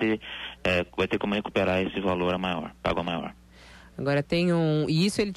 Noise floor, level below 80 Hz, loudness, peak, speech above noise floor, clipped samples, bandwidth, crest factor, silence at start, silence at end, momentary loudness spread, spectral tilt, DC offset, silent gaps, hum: -50 dBFS; -50 dBFS; -27 LUFS; -12 dBFS; 24 dB; under 0.1%; 13 kHz; 14 dB; 0 s; 0 s; 8 LU; -6 dB/octave; under 0.1%; none; none